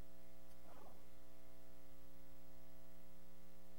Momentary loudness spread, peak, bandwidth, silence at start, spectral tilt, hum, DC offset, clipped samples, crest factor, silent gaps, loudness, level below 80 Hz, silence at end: 3 LU; -40 dBFS; over 20 kHz; 0 s; -5.5 dB/octave; 60 Hz at -70 dBFS; 0.7%; under 0.1%; 14 dB; none; -66 LUFS; -70 dBFS; 0 s